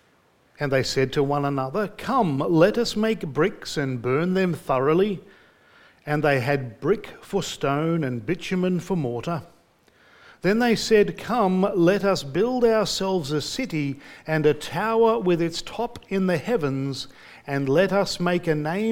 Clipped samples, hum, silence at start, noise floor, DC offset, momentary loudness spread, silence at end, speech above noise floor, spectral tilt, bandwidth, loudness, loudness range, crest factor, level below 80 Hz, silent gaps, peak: under 0.1%; none; 0.6 s; -61 dBFS; under 0.1%; 9 LU; 0 s; 38 dB; -6 dB/octave; 17 kHz; -23 LUFS; 4 LU; 20 dB; -52 dBFS; none; -4 dBFS